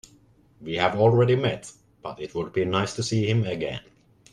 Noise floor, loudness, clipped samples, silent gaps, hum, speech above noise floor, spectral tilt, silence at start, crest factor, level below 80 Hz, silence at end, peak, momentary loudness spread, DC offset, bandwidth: -57 dBFS; -24 LUFS; under 0.1%; none; none; 34 dB; -6 dB/octave; 0.6 s; 20 dB; -56 dBFS; 0.55 s; -6 dBFS; 19 LU; under 0.1%; 11 kHz